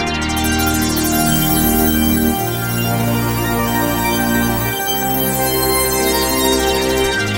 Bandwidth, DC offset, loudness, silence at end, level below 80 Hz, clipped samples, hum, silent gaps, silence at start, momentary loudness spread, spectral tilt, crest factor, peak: 16.5 kHz; under 0.1%; -15 LUFS; 0 s; -30 dBFS; under 0.1%; none; none; 0 s; 4 LU; -4 dB/octave; 14 dB; -2 dBFS